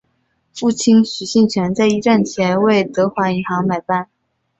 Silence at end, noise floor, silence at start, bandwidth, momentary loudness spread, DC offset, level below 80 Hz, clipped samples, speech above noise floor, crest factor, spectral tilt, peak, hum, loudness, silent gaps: 0.55 s; -65 dBFS; 0.55 s; 8.2 kHz; 8 LU; under 0.1%; -54 dBFS; under 0.1%; 50 dB; 14 dB; -5.5 dB/octave; -4 dBFS; none; -16 LUFS; none